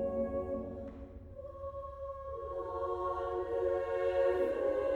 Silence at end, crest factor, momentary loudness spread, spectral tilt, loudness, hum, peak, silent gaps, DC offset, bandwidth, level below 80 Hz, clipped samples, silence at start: 0 s; 16 dB; 15 LU; -8 dB/octave; -36 LUFS; none; -20 dBFS; none; under 0.1%; 7 kHz; -54 dBFS; under 0.1%; 0 s